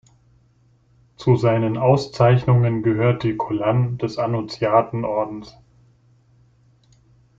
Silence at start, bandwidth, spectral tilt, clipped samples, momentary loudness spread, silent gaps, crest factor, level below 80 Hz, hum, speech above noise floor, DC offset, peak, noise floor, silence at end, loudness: 1.2 s; 7.6 kHz; -8.5 dB/octave; under 0.1%; 7 LU; none; 18 dB; -52 dBFS; none; 39 dB; under 0.1%; -4 dBFS; -58 dBFS; 1.9 s; -20 LUFS